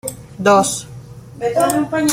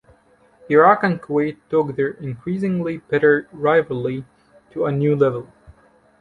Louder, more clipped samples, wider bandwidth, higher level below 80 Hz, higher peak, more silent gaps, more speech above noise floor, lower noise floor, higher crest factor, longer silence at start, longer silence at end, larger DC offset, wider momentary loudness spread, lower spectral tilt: first, -16 LUFS vs -19 LUFS; neither; first, 16.5 kHz vs 4.6 kHz; first, -50 dBFS vs -58 dBFS; about the same, -2 dBFS vs -2 dBFS; neither; second, 20 dB vs 36 dB; second, -35 dBFS vs -55 dBFS; about the same, 16 dB vs 18 dB; second, 0.05 s vs 0.7 s; second, 0 s vs 0.5 s; neither; first, 22 LU vs 12 LU; second, -4 dB/octave vs -9 dB/octave